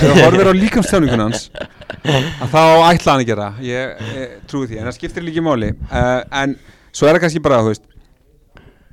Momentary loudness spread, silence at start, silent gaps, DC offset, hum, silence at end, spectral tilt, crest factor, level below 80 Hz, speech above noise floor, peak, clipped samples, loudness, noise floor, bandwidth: 17 LU; 0 s; none; under 0.1%; none; 1.15 s; -5.5 dB/octave; 14 dB; -36 dBFS; 37 dB; 0 dBFS; under 0.1%; -14 LUFS; -51 dBFS; 18 kHz